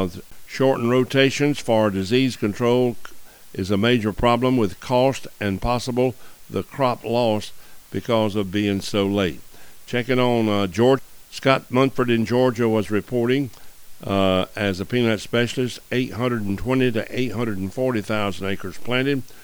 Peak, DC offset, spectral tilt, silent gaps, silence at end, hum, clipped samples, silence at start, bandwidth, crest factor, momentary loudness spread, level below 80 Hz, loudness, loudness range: -2 dBFS; under 0.1%; -6 dB/octave; none; 0 s; none; under 0.1%; 0 s; over 20 kHz; 20 dB; 9 LU; -46 dBFS; -22 LUFS; 3 LU